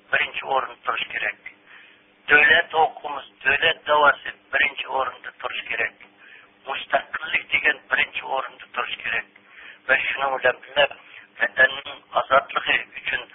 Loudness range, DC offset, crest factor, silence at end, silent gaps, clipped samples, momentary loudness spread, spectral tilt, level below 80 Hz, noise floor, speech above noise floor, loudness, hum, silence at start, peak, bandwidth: 5 LU; under 0.1%; 22 dB; 0.1 s; none; under 0.1%; 13 LU; -6.5 dB/octave; -58 dBFS; -52 dBFS; 29 dB; -21 LUFS; none; 0.1 s; -2 dBFS; 4 kHz